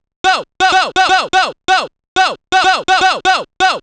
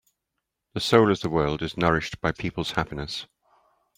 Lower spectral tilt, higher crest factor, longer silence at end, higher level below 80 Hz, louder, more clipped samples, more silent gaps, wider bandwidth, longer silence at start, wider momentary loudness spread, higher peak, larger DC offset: second, -1 dB/octave vs -5.5 dB/octave; second, 12 dB vs 22 dB; second, 0 s vs 0.75 s; about the same, -46 dBFS vs -48 dBFS; first, -13 LUFS vs -25 LUFS; neither; first, 2.08-2.16 s vs none; second, 10 kHz vs 16 kHz; second, 0.25 s vs 0.75 s; second, 4 LU vs 13 LU; first, 0 dBFS vs -4 dBFS; neither